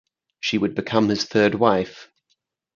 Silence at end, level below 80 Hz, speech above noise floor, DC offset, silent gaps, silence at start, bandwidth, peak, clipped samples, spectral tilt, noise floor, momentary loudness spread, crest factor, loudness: 0.7 s; -56 dBFS; 51 dB; under 0.1%; none; 0.45 s; 7.4 kHz; 0 dBFS; under 0.1%; -5.5 dB/octave; -72 dBFS; 8 LU; 22 dB; -21 LUFS